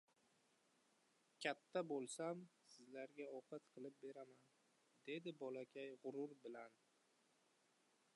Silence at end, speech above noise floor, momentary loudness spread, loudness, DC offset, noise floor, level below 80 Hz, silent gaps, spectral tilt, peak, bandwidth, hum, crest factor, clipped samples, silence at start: 1.45 s; 29 dB; 14 LU; -52 LUFS; under 0.1%; -81 dBFS; under -90 dBFS; none; -4 dB/octave; -30 dBFS; 11 kHz; none; 24 dB; under 0.1%; 1.4 s